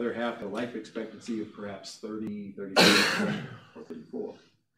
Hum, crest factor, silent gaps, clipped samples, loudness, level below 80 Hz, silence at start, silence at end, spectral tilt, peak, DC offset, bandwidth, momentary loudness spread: none; 24 dB; none; under 0.1%; -27 LUFS; -70 dBFS; 0 s; 0.4 s; -3.5 dB/octave; -6 dBFS; under 0.1%; 16 kHz; 22 LU